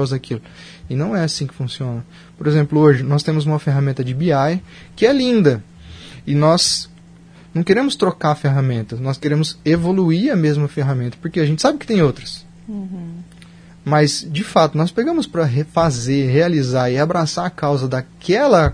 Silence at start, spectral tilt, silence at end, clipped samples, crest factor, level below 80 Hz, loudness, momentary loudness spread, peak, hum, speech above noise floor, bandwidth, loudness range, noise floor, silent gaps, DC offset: 0 s; -6 dB/octave; 0 s; under 0.1%; 18 dB; -44 dBFS; -17 LUFS; 15 LU; 0 dBFS; none; 26 dB; 10.5 kHz; 3 LU; -43 dBFS; none; under 0.1%